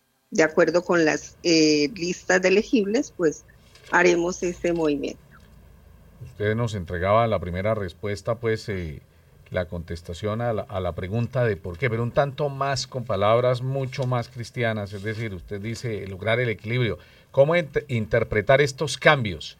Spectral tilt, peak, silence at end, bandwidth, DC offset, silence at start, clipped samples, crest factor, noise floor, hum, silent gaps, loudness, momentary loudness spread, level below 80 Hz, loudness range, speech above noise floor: -5.5 dB/octave; 0 dBFS; 0.05 s; 15.5 kHz; under 0.1%; 0.3 s; under 0.1%; 24 dB; -50 dBFS; none; none; -24 LUFS; 12 LU; -52 dBFS; 7 LU; 27 dB